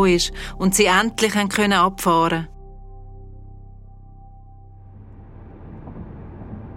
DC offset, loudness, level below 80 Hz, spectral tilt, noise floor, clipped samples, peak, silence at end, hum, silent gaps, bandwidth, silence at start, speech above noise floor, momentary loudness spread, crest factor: under 0.1%; -18 LUFS; -40 dBFS; -4 dB/octave; -42 dBFS; under 0.1%; -2 dBFS; 0.05 s; none; none; 16 kHz; 0 s; 24 dB; 22 LU; 20 dB